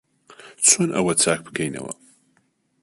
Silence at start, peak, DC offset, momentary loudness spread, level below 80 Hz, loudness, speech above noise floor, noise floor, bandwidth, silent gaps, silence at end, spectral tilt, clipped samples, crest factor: 0.45 s; -2 dBFS; under 0.1%; 19 LU; -62 dBFS; -19 LUFS; 45 dB; -66 dBFS; 12 kHz; none; 0.9 s; -2.5 dB/octave; under 0.1%; 22 dB